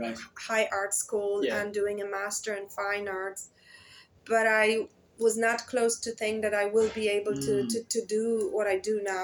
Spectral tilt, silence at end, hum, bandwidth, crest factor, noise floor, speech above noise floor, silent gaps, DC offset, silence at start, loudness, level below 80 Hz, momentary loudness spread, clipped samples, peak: -2.5 dB/octave; 0 s; none; over 20 kHz; 18 dB; -55 dBFS; 26 dB; none; under 0.1%; 0 s; -29 LUFS; -68 dBFS; 8 LU; under 0.1%; -10 dBFS